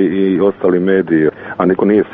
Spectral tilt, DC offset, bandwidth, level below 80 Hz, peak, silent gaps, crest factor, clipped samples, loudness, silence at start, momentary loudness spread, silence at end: -7 dB/octave; under 0.1%; 3.8 kHz; -50 dBFS; -2 dBFS; none; 12 dB; under 0.1%; -13 LUFS; 0 s; 4 LU; 0 s